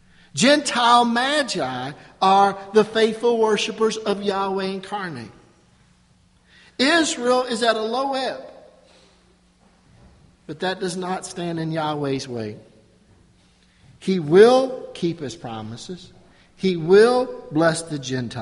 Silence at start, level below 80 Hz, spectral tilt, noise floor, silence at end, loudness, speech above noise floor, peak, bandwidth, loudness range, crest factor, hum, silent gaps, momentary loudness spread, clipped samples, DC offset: 0.35 s; -60 dBFS; -4.5 dB/octave; -57 dBFS; 0 s; -20 LUFS; 37 dB; 0 dBFS; 11.5 kHz; 10 LU; 22 dB; none; none; 17 LU; under 0.1%; under 0.1%